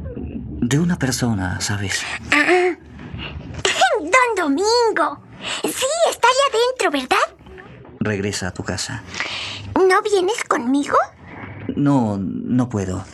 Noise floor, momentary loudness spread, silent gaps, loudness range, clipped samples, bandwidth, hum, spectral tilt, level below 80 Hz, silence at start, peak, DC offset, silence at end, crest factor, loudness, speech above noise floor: -40 dBFS; 14 LU; none; 4 LU; under 0.1%; 13.5 kHz; none; -4 dB/octave; -46 dBFS; 0 s; -2 dBFS; under 0.1%; 0 s; 18 dB; -19 LUFS; 21 dB